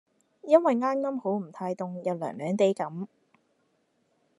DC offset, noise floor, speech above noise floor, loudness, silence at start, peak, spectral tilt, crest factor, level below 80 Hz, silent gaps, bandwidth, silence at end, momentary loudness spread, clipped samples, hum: under 0.1%; -72 dBFS; 45 dB; -27 LUFS; 0.45 s; -6 dBFS; -7 dB/octave; 22 dB; -84 dBFS; none; 11 kHz; 1.3 s; 13 LU; under 0.1%; none